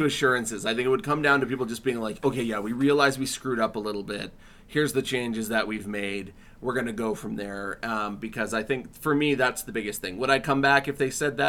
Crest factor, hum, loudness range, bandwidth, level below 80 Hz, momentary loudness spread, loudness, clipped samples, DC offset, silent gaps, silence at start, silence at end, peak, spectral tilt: 20 dB; none; 5 LU; 17.5 kHz; -54 dBFS; 11 LU; -26 LUFS; under 0.1%; under 0.1%; none; 0 s; 0 s; -6 dBFS; -4.5 dB/octave